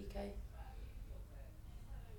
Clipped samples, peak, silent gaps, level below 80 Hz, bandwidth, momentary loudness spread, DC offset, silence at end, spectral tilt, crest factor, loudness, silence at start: under 0.1%; -34 dBFS; none; -52 dBFS; 19 kHz; 8 LU; under 0.1%; 0 s; -6.5 dB/octave; 16 dB; -53 LUFS; 0 s